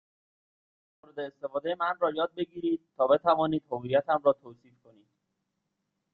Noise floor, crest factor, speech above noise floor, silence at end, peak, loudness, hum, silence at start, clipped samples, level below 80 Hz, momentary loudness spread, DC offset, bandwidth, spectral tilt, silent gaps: -81 dBFS; 20 dB; 53 dB; 1.6 s; -10 dBFS; -28 LUFS; none; 1.15 s; under 0.1%; -72 dBFS; 12 LU; under 0.1%; 4.4 kHz; -9 dB/octave; none